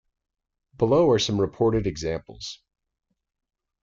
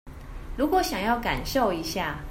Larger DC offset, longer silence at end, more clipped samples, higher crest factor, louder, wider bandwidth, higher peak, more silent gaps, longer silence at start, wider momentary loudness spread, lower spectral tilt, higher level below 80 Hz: neither; first, 1.25 s vs 0 s; neither; about the same, 16 dB vs 16 dB; first, -23 LUFS vs -26 LUFS; second, 7.6 kHz vs 16 kHz; about the same, -10 dBFS vs -10 dBFS; neither; first, 0.8 s vs 0.05 s; about the same, 18 LU vs 16 LU; first, -6 dB/octave vs -4.5 dB/octave; second, -48 dBFS vs -40 dBFS